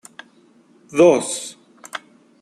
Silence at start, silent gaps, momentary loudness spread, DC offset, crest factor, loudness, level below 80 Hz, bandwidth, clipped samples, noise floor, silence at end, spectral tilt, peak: 0.9 s; none; 20 LU; under 0.1%; 20 dB; -17 LUFS; -70 dBFS; 12.5 kHz; under 0.1%; -53 dBFS; 0.45 s; -4 dB/octave; -2 dBFS